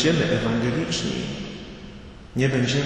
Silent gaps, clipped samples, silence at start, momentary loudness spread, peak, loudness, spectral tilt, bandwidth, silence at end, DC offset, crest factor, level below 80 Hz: none; under 0.1%; 0 s; 19 LU; -8 dBFS; -24 LUFS; -5 dB/octave; 9.4 kHz; 0 s; under 0.1%; 16 dB; -44 dBFS